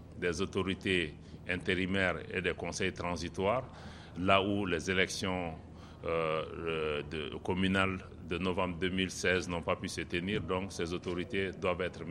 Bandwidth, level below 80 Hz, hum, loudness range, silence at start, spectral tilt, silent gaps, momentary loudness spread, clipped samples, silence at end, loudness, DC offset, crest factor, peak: 13 kHz; -54 dBFS; none; 2 LU; 0 s; -5 dB/octave; none; 9 LU; under 0.1%; 0 s; -34 LUFS; under 0.1%; 24 dB; -10 dBFS